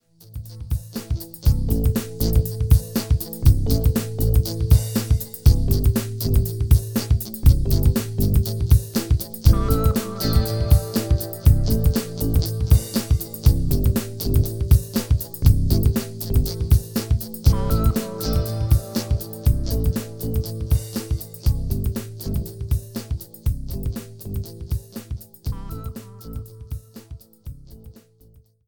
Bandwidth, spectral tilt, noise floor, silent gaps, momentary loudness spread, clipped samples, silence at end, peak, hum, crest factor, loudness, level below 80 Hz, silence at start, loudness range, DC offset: 19.5 kHz; -6.5 dB/octave; -53 dBFS; none; 13 LU; under 0.1%; 0 s; -2 dBFS; none; 18 dB; -22 LUFS; -24 dBFS; 0 s; 11 LU; under 0.1%